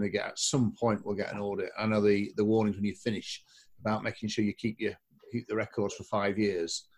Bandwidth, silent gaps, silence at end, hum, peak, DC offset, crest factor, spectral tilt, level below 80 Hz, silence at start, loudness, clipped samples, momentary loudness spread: 12 kHz; none; 0.15 s; none; -14 dBFS; under 0.1%; 18 dB; -5 dB/octave; -60 dBFS; 0 s; -31 LUFS; under 0.1%; 10 LU